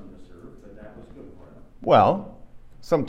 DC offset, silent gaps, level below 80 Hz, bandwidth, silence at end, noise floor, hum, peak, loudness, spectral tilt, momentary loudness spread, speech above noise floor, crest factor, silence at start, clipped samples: under 0.1%; none; -50 dBFS; 15 kHz; 0 s; -44 dBFS; none; -4 dBFS; -21 LUFS; -7.5 dB/octave; 28 LU; 22 dB; 22 dB; 0 s; under 0.1%